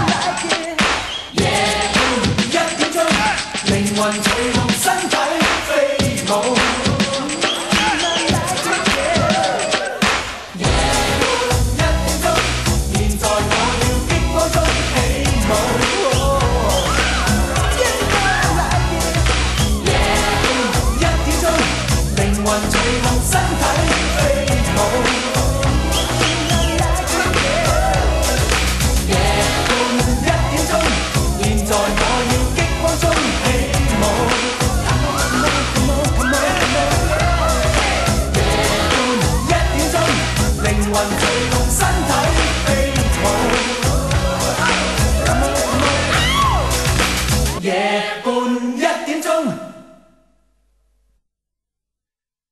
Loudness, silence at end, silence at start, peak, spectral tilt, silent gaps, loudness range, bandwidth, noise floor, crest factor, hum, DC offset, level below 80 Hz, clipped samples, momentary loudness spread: -16 LUFS; 2.7 s; 0 s; 0 dBFS; -4 dB/octave; none; 1 LU; 13 kHz; -89 dBFS; 16 dB; none; under 0.1%; -24 dBFS; under 0.1%; 3 LU